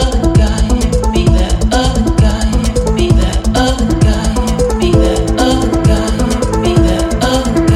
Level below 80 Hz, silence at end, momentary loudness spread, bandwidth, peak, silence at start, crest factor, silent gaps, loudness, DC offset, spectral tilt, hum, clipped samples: -14 dBFS; 0 s; 3 LU; 13.5 kHz; 0 dBFS; 0 s; 10 dB; none; -12 LUFS; under 0.1%; -6 dB/octave; none; under 0.1%